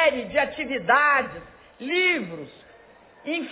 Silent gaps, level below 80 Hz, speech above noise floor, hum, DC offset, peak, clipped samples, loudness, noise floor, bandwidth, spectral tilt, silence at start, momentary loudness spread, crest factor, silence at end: none; -60 dBFS; 28 dB; none; under 0.1%; -6 dBFS; under 0.1%; -22 LUFS; -52 dBFS; 4 kHz; -7 dB/octave; 0 s; 21 LU; 18 dB; 0 s